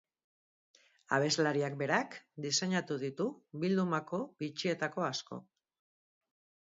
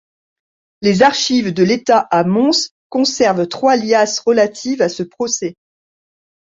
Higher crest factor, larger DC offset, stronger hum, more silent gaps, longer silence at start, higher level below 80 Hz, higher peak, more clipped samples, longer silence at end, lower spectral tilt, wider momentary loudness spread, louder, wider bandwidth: first, 22 dB vs 16 dB; neither; neither; second, none vs 2.71-2.90 s; first, 1.1 s vs 0.8 s; second, -82 dBFS vs -58 dBFS; second, -14 dBFS vs 0 dBFS; neither; first, 1.3 s vs 1.05 s; about the same, -4 dB/octave vs -4 dB/octave; first, 10 LU vs 7 LU; second, -34 LUFS vs -15 LUFS; about the same, 7.6 kHz vs 7.8 kHz